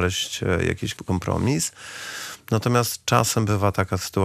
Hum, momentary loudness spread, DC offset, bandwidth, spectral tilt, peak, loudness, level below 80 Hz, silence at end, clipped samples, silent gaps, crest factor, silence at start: none; 11 LU; under 0.1%; 15.5 kHz; -4.5 dB/octave; -2 dBFS; -23 LUFS; -50 dBFS; 0 s; under 0.1%; none; 20 dB; 0 s